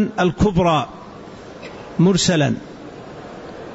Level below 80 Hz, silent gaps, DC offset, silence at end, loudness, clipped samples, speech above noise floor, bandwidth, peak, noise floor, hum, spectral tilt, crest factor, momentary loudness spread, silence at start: -40 dBFS; none; under 0.1%; 0 s; -18 LUFS; under 0.1%; 20 dB; 8 kHz; -6 dBFS; -37 dBFS; none; -5.5 dB/octave; 14 dB; 21 LU; 0 s